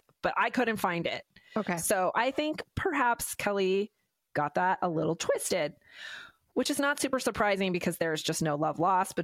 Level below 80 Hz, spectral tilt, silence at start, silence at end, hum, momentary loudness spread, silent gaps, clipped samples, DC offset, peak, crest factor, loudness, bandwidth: -60 dBFS; -4 dB/octave; 0.25 s; 0 s; none; 9 LU; none; under 0.1%; under 0.1%; -14 dBFS; 16 dB; -30 LUFS; 16.5 kHz